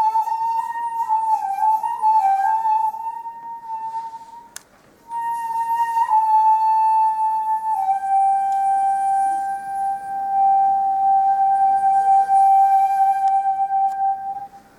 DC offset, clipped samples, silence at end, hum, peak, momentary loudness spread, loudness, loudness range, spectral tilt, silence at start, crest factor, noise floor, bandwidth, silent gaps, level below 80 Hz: under 0.1%; under 0.1%; 0.2 s; none; -8 dBFS; 14 LU; -19 LUFS; 7 LU; -2 dB/octave; 0 s; 10 dB; -51 dBFS; 13.5 kHz; none; -66 dBFS